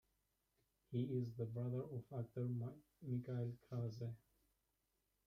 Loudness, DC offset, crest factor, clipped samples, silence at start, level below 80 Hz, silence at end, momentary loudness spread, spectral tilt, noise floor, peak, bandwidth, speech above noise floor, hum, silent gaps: -47 LUFS; under 0.1%; 16 dB; under 0.1%; 0.9 s; -78 dBFS; 1.1 s; 8 LU; -10 dB/octave; -86 dBFS; -32 dBFS; 6.4 kHz; 41 dB; none; none